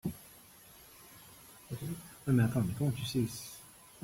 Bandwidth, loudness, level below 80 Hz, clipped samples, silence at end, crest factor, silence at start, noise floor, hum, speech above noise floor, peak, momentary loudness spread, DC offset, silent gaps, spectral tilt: 16.5 kHz; -34 LUFS; -60 dBFS; under 0.1%; 0.05 s; 18 dB; 0.05 s; -57 dBFS; none; 26 dB; -18 dBFS; 24 LU; under 0.1%; none; -6 dB/octave